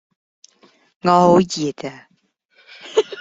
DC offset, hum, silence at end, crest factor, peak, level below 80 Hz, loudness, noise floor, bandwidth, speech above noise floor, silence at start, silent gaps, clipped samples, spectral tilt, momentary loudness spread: under 0.1%; none; 0 s; 18 dB; -2 dBFS; -58 dBFS; -17 LUFS; -63 dBFS; 8 kHz; 47 dB; 1.05 s; 2.45-2.49 s; under 0.1%; -5.5 dB/octave; 20 LU